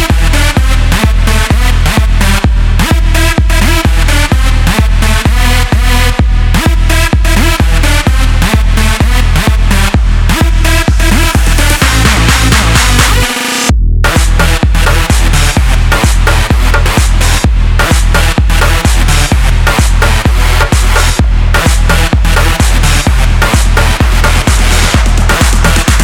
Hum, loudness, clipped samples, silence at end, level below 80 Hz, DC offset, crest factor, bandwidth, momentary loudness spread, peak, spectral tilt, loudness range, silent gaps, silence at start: none; -9 LUFS; 0.2%; 0 s; -8 dBFS; under 0.1%; 6 dB; 17 kHz; 2 LU; 0 dBFS; -4 dB/octave; 1 LU; none; 0 s